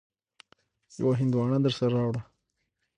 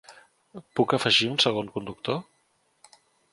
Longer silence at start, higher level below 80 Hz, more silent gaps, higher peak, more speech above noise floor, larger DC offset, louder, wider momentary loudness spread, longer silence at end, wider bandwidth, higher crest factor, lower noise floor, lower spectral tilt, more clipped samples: first, 1 s vs 0.1 s; about the same, -64 dBFS vs -66 dBFS; neither; second, -14 dBFS vs -8 dBFS; first, 53 dB vs 43 dB; neither; about the same, -27 LUFS vs -25 LUFS; second, 9 LU vs 13 LU; second, 0.75 s vs 1.1 s; second, 9.6 kHz vs 11.5 kHz; second, 16 dB vs 22 dB; first, -79 dBFS vs -69 dBFS; first, -8 dB/octave vs -4 dB/octave; neither